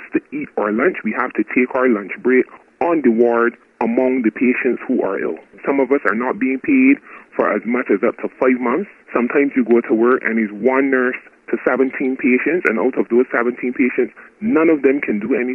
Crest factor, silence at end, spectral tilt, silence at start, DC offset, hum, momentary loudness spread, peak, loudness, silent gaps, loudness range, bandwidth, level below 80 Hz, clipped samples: 16 dB; 0 s; -9 dB/octave; 0 s; under 0.1%; none; 8 LU; 0 dBFS; -17 LUFS; none; 1 LU; 3.2 kHz; -64 dBFS; under 0.1%